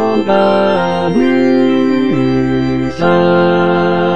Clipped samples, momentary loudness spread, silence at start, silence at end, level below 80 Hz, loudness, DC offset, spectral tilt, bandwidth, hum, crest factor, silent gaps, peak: under 0.1%; 3 LU; 0 s; 0 s; -42 dBFS; -12 LUFS; 3%; -7.5 dB/octave; 8.4 kHz; none; 12 dB; none; 0 dBFS